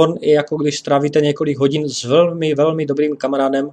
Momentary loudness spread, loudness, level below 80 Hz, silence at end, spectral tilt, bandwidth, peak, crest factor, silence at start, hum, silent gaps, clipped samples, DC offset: 4 LU; -16 LUFS; -62 dBFS; 0 s; -5.5 dB/octave; 9.4 kHz; 0 dBFS; 16 dB; 0 s; none; none; under 0.1%; under 0.1%